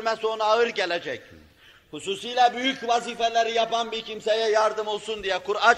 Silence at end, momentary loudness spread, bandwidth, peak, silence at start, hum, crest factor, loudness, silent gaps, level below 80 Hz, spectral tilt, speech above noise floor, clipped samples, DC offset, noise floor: 0 s; 10 LU; 12 kHz; -4 dBFS; 0 s; none; 20 dB; -24 LUFS; none; -62 dBFS; -2 dB/octave; 30 dB; under 0.1%; under 0.1%; -54 dBFS